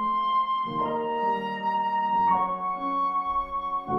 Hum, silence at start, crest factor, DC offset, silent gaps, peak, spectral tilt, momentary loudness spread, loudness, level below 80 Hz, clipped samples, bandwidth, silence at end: none; 0 s; 14 dB; under 0.1%; none; -12 dBFS; -7 dB/octave; 5 LU; -26 LUFS; -56 dBFS; under 0.1%; 6 kHz; 0 s